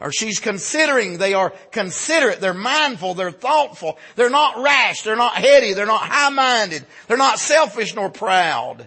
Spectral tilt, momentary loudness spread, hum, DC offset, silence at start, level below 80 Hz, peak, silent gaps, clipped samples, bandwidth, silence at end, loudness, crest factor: -2 dB/octave; 10 LU; none; under 0.1%; 0 s; -66 dBFS; -2 dBFS; none; under 0.1%; 8.8 kHz; 0 s; -17 LUFS; 16 dB